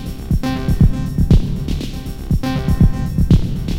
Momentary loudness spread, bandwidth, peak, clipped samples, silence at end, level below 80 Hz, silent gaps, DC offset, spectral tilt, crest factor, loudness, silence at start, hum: 8 LU; 16.5 kHz; 0 dBFS; under 0.1%; 0 s; -20 dBFS; none; 0.6%; -7.5 dB/octave; 16 dB; -18 LUFS; 0 s; none